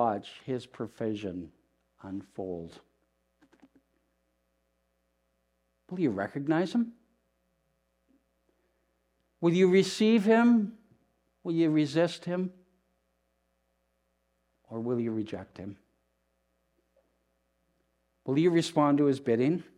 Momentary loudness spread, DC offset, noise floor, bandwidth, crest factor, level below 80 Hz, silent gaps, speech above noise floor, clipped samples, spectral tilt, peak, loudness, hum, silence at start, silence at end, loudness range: 19 LU; under 0.1%; -76 dBFS; 11.5 kHz; 20 dB; -76 dBFS; none; 48 dB; under 0.1%; -6.5 dB/octave; -12 dBFS; -28 LUFS; none; 0 s; 0.15 s; 17 LU